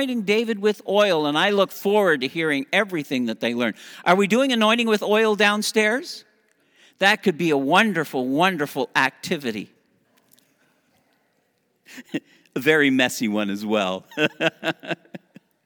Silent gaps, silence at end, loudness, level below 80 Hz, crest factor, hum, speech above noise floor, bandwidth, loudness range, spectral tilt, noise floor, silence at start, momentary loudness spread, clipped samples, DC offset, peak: none; 0.5 s; -21 LUFS; -78 dBFS; 22 dB; none; 47 dB; over 20 kHz; 8 LU; -4 dB/octave; -68 dBFS; 0 s; 12 LU; under 0.1%; under 0.1%; 0 dBFS